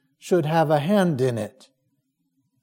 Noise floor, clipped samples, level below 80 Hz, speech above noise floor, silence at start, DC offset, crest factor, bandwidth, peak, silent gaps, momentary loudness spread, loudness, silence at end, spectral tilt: -73 dBFS; under 0.1%; -70 dBFS; 51 dB; 0.25 s; under 0.1%; 18 dB; 16.5 kHz; -6 dBFS; none; 9 LU; -22 LUFS; 1.15 s; -7 dB/octave